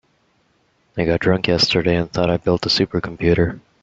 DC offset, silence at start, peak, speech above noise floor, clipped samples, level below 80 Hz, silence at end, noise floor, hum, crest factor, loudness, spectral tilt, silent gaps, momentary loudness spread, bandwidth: under 0.1%; 0.95 s; -2 dBFS; 44 dB; under 0.1%; -42 dBFS; 0.25 s; -62 dBFS; none; 18 dB; -18 LUFS; -5.5 dB/octave; none; 6 LU; 7.8 kHz